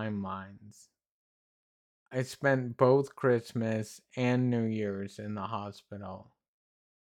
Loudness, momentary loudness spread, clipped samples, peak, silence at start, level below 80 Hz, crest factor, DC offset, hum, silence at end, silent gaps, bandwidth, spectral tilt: -31 LUFS; 18 LU; under 0.1%; -10 dBFS; 0 s; -78 dBFS; 22 dB; under 0.1%; none; 0.85 s; 1.11-2.06 s; 14 kHz; -7 dB/octave